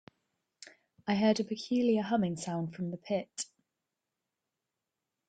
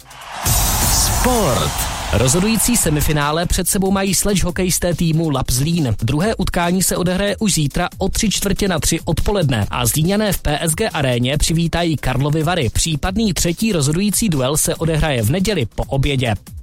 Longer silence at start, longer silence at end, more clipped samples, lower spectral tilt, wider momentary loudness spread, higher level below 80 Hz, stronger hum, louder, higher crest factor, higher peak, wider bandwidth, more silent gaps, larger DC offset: first, 0.65 s vs 0.1 s; first, 1.85 s vs 0 s; neither; first, -5.5 dB/octave vs -4 dB/octave; first, 13 LU vs 4 LU; second, -74 dBFS vs -26 dBFS; neither; second, -33 LUFS vs -17 LUFS; first, 20 dB vs 14 dB; second, -14 dBFS vs -2 dBFS; second, 9.4 kHz vs 16.5 kHz; neither; neither